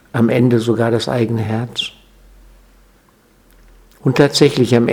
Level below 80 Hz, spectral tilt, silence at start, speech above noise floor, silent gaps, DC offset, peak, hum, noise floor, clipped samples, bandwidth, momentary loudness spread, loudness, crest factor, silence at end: -50 dBFS; -6 dB/octave; 0.15 s; 38 dB; none; under 0.1%; 0 dBFS; none; -52 dBFS; under 0.1%; 16.5 kHz; 10 LU; -15 LUFS; 16 dB; 0 s